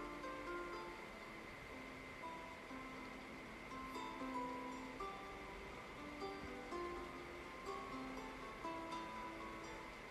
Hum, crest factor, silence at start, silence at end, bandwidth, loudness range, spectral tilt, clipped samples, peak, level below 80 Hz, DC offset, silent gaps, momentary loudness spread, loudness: none; 16 dB; 0 s; 0 s; 13.5 kHz; 2 LU; -4.5 dB/octave; under 0.1%; -34 dBFS; -66 dBFS; under 0.1%; none; 5 LU; -50 LUFS